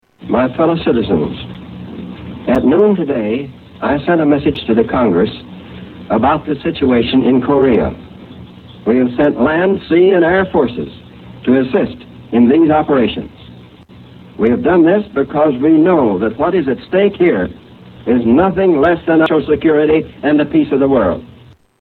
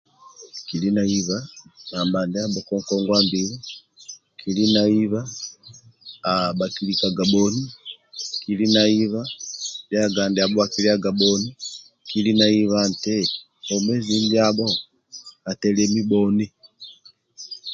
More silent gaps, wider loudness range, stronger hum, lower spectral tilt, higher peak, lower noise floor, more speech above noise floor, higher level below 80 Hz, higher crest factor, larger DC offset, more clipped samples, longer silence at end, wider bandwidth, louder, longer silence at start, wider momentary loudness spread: neither; about the same, 3 LU vs 4 LU; neither; first, -9.5 dB/octave vs -4.5 dB/octave; about the same, 0 dBFS vs -2 dBFS; second, -42 dBFS vs -50 dBFS; about the same, 30 dB vs 30 dB; first, -40 dBFS vs -58 dBFS; second, 12 dB vs 20 dB; neither; neither; first, 0.55 s vs 0 s; second, 4.5 kHz vs 7.6 kHz; first, -13 LUFS vs -21 LUFS; second, 0.2 s vs 0.4 s; second, 15 LU vs 20 LU